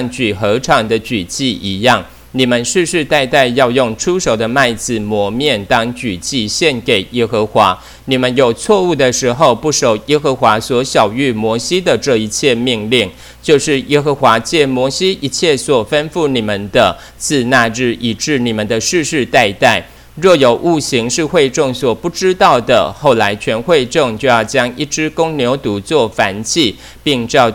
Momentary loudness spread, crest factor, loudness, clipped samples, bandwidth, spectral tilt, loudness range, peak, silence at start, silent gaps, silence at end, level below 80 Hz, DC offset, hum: 6 LU; 12 dB; -13 LUFS; 0.4%; 19 kHz; -4 dB/octave; 2 LU; 0 dBFS; 0 s; none; 0 s; -42 dBFS; under 0.1%; none